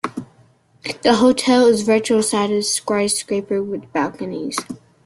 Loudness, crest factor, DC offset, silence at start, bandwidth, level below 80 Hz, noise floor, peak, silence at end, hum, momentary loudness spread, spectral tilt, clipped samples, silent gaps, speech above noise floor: -18 LUFS; 16 dB; under 0.1%; 0.05 s; 12.5 kHz; -58 dBFS; -54 dBFS; -2 dBFS; 0.3 s; none; 14 LU; -3.5 dB/octave; under 0.1%; none; 36 dB